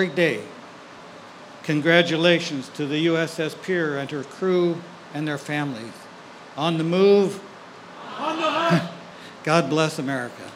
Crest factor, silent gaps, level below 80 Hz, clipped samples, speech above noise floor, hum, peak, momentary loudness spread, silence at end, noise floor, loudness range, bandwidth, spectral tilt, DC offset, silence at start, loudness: 22 dB; none; -74 dBFS; under 0.1%; 21 dB; none; -2 dBFS; 24 LU; 0 s; -42 dBFS; 4 LU; 15 kHz; -5.5 dB/octave; under 0.1%; 0 s; -22 LUFS